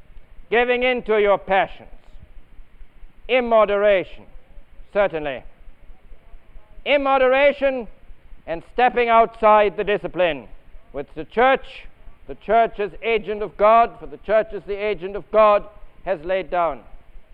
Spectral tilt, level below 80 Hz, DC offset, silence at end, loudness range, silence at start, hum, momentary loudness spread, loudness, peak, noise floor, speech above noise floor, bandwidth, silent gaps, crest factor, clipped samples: -7 dB/octave; -42 dBFS; 0.1%; 0.1 s; 4 LU; 0.15 s; none; 17 LU; -19 LUFS; -4 dBFS; -39 dBFS; 20 dB; 5 kHz; none; 18 dB; under 0.1%